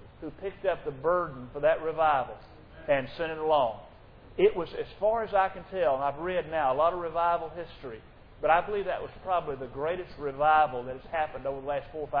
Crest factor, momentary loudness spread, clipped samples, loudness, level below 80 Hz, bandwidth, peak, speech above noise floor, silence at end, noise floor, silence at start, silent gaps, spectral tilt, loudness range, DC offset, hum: 20 dB; 13 LU; under 0.1%; -29 LUFS; -54 dBFS; 5.2 kHz; -10 dBFS; 22 dB; 0 s; -51 dBFS; 0 s; none; -8.5 dB/octave; 2 LU; under 0.1%; none